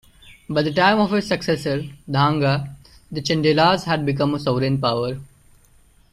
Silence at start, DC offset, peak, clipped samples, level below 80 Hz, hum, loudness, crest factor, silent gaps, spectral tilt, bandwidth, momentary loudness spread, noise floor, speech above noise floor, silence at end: 0.25 s; under 0.1%; -4 dBFS; under 0.1%; -50 dBFS; none; -20 LUFS; 18 dB; none; -6 dB/octave; 14 kHz; 11 LU; -53 dBFS; 34 dB; 0.85 s